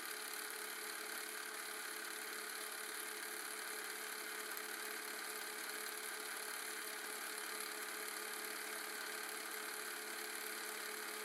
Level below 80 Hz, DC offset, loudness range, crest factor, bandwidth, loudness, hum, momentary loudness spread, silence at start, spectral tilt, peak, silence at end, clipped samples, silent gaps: under -90 dBFS; under 0.1%; 1 LU; 20 dB; 17 kHz; -44 LUFS; none; 1 LU; 0 s; 1.5 dB/octave; -26 dBFS; 0 s; under 0.1%; none